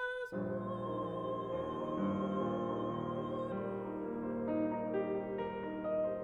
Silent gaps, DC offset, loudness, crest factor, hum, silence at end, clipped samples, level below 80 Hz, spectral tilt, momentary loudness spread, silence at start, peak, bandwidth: none; under 0.1%; -38 LUFS; 14 dB; none; 0 s; under 0.1%; -64 dBFS; -8.5 dB/octave; 4 LU; 0 s; -24 dBFS; 7.2 kHz